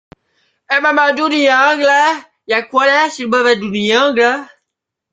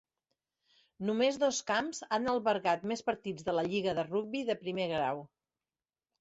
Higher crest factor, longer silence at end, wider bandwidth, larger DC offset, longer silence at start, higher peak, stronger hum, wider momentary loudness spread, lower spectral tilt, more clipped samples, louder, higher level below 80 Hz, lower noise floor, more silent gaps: about the same, 14 dB vs 18 dB; second, 0.65 s vs 0.95 s; first, 9.4 kHz vs 8.2 kHz; neither; second, 0.7 s vs 1 s; first, 0 dBFS vs -16 dBFS; neither; about the same, 7 LU vs 6 LU; about the same, -3.5 dB/octave vs -4 dB/octave; neither; first, -13 LUFS vs -33 LUFS; first, -60 dBFS vs -70 dBFS; second, -78 dBFS vs under -90 dBFS; neither